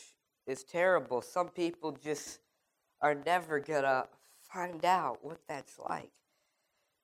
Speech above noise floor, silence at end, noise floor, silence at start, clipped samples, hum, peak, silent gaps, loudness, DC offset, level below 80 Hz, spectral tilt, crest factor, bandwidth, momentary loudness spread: 46 dB; 0.95 s; -80 dBFS; 0 s; under 0.1%; none; -16 dBFS; none; -34 LUFS; under 0.1%; -80 dBFS; -4 dB/octave; 20 dB; 16 kHz; 15 LU